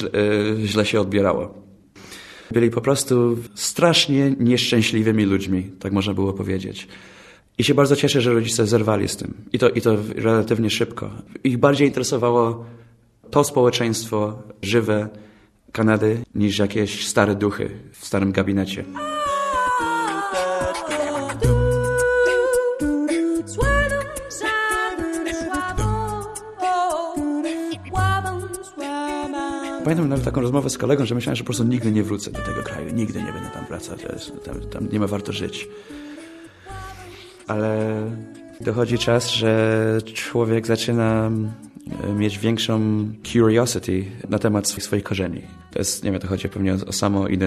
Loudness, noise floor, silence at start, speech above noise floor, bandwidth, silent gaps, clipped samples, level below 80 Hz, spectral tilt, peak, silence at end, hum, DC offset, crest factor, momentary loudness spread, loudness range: -21 LUFS; -49 dBFS; 0 s; 29 dB; 13 kHz; none; under 0.1%; -40 dBFS; -5 dB/octave; 0 dBFS; 0 s; none; under 0.1%; 20 dB; 14 LU; 7 LU